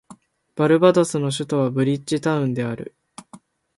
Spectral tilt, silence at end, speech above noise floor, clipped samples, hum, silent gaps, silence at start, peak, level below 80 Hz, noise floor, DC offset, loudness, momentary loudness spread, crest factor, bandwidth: -6 dB/octave; 0.4 s; 29 dB; under 0.1%; none; none; 0.1 s; -2 dBFS; -62 dBFS; -49 dBFS; under 0.1%; -20 LUFS; 15 LU; 18 dB; 11.5 kHz